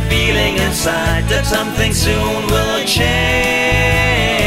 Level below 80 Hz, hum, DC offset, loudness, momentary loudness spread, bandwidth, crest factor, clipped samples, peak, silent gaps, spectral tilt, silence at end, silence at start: -24 dBFS; none; under 0.1%; -14 LUFS; 3 LU; 16.5 kHz; 12 dB; under 0.1%; -2 dBFS; none; -4 dB/octave; 0 s; 0 s